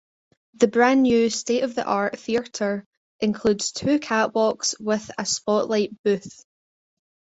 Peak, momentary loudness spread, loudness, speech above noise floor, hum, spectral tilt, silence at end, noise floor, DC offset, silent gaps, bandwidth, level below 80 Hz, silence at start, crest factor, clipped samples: -4 dBFS; 8 LU; -22 LUFS; over 68 dB; none; -3.5 dB/octave; 1 s; under -90 dBFS; under 0.1%; 2.86-3.19 s, 5.99-6.04 s; 8.2 kHz; -60 dBFS; 0.6 s; 20 dB; under 0.1%